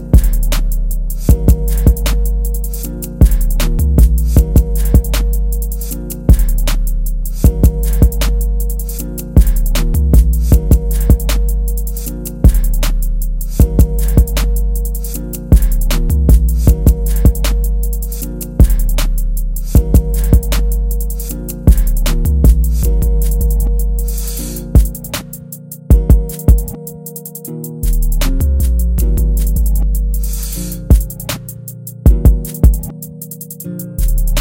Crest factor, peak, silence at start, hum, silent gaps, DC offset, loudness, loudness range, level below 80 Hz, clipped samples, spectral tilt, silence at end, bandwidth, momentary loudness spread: 12 dB; 0 dBFS; 0 s; none; none; under 0.1%; -15 LUFS; 2 LU; -12 dBFS; 0.6%; -6 dB/octave; 0 s; 17.5 kHz; 11 LU